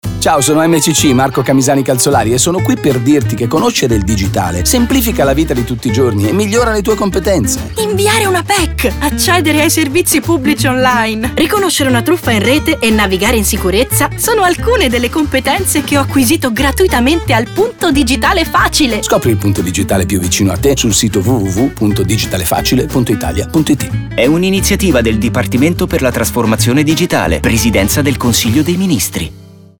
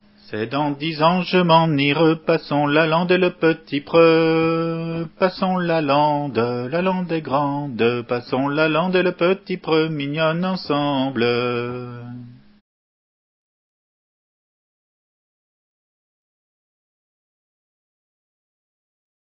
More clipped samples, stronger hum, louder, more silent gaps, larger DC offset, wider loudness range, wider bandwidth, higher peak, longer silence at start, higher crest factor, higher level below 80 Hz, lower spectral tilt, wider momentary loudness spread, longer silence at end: neither; neither; first, -11 LUFS vs -19 LUFS; neither; neither; second, 1 LU vs 7 LU; first, over 20 kHz vs 5.8 kHz; about the same, 0 dBFS vs -2 dBFS; second, 0.05 s vs 0.3 s; second, 12 dB vs 20 dB; first, -26 dBFS vs -62 dBFS; second, -4.5 dB/octave vs -11 dB/octave; second, 4 LU vs 10 LU; second, 0.3 s vs 7 s